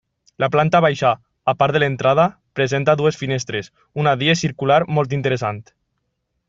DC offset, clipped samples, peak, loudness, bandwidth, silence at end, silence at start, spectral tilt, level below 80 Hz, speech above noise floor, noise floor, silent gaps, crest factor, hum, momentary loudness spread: under 0.1%; under 0.1%; -2 dBFS; -18 LUFS; 7.8 kHz; 0.85 s; 0.4 s; -5.5 dB/octave; -56 dBFS; 55 dB; -73 dBFS; none; 16 dB; none; 8 LU